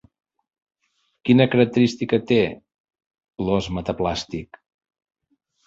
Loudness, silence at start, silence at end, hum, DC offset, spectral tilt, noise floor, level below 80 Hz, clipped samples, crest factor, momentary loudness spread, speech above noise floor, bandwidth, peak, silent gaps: -21 LUFS; 1.25 s; 1.25 s; none; under 0.1%; -6.5 dB/octave; -70 dBFS; -48 dBFS; under 0.1%; 22 dB; 13 LU; 50 dB; 7.8 kHz; -2 dBFS; 2.80-2.84 s, 3.06-3.10 s